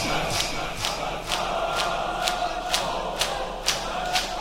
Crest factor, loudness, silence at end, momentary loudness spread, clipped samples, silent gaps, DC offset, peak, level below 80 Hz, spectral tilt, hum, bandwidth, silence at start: 26 dB; -26 LUFS; 0 s; 2 LU; under 0.1%; none; under 0.1%; 0 dBFS; -40 dBFS; -2 dB/octave; none; 17 kHz; 0 s